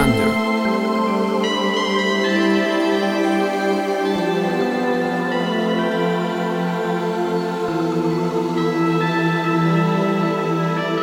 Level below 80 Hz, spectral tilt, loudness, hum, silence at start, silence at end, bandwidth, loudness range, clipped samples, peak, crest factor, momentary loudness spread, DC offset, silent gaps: -46 dBFS; -6 dB/octave; -19 LUFS; none; 0 s; 0 s; 16.5 kHz; 2 LU; under 0.1%; -4 dBFS; 14 dB; 4 LU; under 0.1%; none